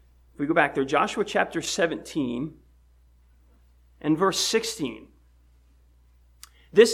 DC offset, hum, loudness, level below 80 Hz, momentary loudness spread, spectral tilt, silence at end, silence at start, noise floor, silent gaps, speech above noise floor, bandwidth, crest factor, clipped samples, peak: under 0.1%; none; -25 LUFS; -56 dBFS; 11 LU; -3.5 dB/octave; 0 s; 0.4 s; -58 dBFS; none; 32 dB; 16 kHz; 24 dB; under 0.1%; -4 dBFS